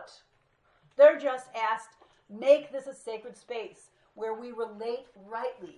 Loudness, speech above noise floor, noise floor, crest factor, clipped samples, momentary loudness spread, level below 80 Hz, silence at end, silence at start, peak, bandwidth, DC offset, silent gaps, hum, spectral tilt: -28 LUFS; 40 dB; -69 dBFS; 22 dB; under 0.1%; 20 LU; -80 dBFS; 0.05 s; 0 s; -8 dBFS; 10.5 kHz; under 0.1%; none; none; -3.5 dB/octave